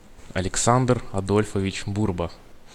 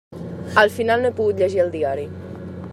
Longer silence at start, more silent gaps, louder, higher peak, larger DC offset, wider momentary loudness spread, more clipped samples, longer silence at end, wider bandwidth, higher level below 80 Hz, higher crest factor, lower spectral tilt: about the same, 0.1 s vs 0.1 s; neither; second, -24 LUFS vs -19 LUFS; about the same, -4 dBFS vs -2 dBFS; neither; second, 11 LU vs 17 LU; neither; about the same, 0 s vs 0 s; about the same, 14.5 kHz vs 15 kHz; first, -42 dBFS vs -60 dBFS; about the same, 20 dB vs 20 dB; about the same, -5 dB/octave vs -5.5 dB/octave